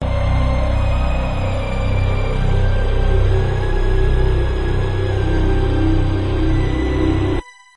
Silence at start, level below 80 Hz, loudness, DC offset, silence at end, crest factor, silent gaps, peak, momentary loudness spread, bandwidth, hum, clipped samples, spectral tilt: 0 s; -18 dBFS; -19 LUFS; 2%; 0 s; 12 dB; none; -4 dBFS; 3 LU; 8.4 kHz; none; under 0.1%; -8 dB/octave